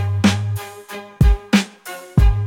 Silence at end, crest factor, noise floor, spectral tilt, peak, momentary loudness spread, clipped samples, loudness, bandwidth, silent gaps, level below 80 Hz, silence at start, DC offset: 0 s; 14 dB; -35 dBFS; -6 dB/octave; -2 dBFS; 16 LU; under 0.1%; -18 LUFS; 16.5 kHz; none; -20 dBFS; 0 s; under 0.1%